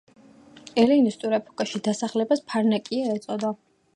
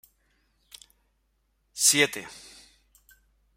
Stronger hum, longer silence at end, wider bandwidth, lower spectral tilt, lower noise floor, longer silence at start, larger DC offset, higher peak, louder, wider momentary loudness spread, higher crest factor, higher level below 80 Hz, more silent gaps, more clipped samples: neither; second, 0.4 s vs 1.2 s; second, 11 kHz vs 16 kHz; first, -5.5 dB/octave vs -0.5 dB/octave; second, -50 dBFS vs -72 dBFS; second, 0.55 s vs 1.75 s; neither; about the same, -6 dBFS vs -6 dBFS; second, -24 LUFS vs -21 LUFS; second, 10 LU vs 24 LU; second, 20 dB vs 26 dB; about the same, -70 dBFS vs -68 dBFS; neither; neither